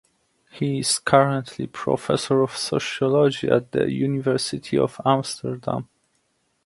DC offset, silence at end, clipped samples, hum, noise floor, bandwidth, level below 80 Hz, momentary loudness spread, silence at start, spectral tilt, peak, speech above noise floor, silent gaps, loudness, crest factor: under 0.1%; 0.8 s; under 0.1%; none; -69 dBFS; 11.5 kHz; -58 dBFS; 11 LU; 0.55 s; -5 dB/octave; 0 dBFS; 47 dB; none; -22 LUFS; 22 dB